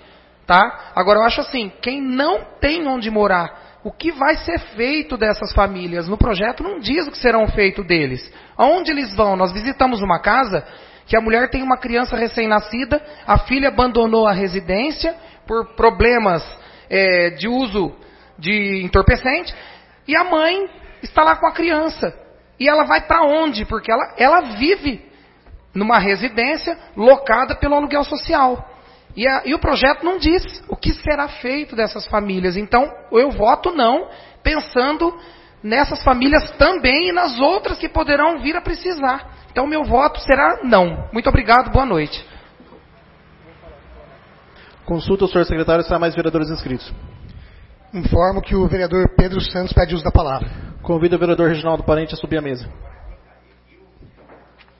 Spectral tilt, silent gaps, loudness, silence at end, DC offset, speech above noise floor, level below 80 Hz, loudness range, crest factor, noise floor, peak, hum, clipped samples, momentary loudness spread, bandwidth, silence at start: -9 dB/octave; none; -17 LUFS; 1.65 s; under 0.1%; 34 dB; -30 dBFS; 4 LU; 18 dB; -50 dBFS; 0 dBFS; none; under 0.1%; 11 LU; 6 kHz; 0.5 s